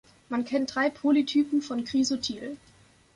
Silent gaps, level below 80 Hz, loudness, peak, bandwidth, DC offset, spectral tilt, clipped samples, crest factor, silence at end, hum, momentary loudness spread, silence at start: none; -64 dBFS; -27 LUFS; -12 dBFS; 11 kHz; under 0.1%; -3.5 dB/octave; under 0.1%; 16 dB; 0.6 s; none; 12 LU; 0.3 s